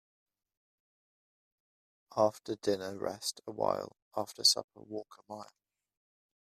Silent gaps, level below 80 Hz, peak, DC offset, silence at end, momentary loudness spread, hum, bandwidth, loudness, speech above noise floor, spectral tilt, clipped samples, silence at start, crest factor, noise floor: 4.02-4.11 s, 4.64-4.68 s; -78 dBFS; -12 dBFS; under 0.1%; 0.95 s; 19 LU; none; 14 kHz; -33 LUFS; over 56 dB; -2.5 dB/octave; under 0.1%; 2.1 s; 24 dB; under -90 dBFS